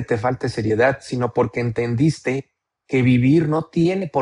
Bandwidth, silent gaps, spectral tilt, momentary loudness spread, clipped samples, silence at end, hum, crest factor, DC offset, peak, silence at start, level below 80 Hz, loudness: 11 kHz; none; -7.5 dB/octave; 8 LU; under 0.1%; 0 s; none; 14 dB; under 0.1%; -4 dBFS; 0 s; -50 dBFS; -20 LUFS